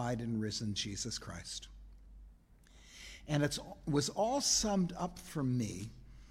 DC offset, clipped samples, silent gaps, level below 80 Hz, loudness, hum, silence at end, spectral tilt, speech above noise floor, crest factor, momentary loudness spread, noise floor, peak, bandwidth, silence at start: under 0.1%; under 0.1%; none; -56 dBFS; -36 LUFS; none; 0 s; -4 dB/octave; 25 dB; 18 dB; 20 LU; -61 dBFS; -18 dBFS; 16 kHz; 0 s